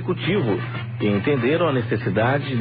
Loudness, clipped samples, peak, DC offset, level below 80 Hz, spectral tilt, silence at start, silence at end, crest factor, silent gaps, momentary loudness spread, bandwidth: -21 LUFS; under 0.1%; -8 dBFS; under 0.1%; -52 dBFS; -12 dB/octave; 0 s; 0 s; 14 dB; none; 5 LU; 5 kHz